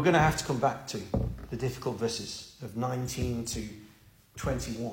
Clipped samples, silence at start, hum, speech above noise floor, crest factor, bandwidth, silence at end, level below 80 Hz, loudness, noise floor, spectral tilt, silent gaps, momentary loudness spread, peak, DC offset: under 0.1%; 0 s; none; 28 dB; 20 dB; 16.5 kHz; 0 s; -46 dBFS; -32 LUFS; -58 dBFS; -5 dB/octave; none; 13 LU; -10 dBFS; under 0.1%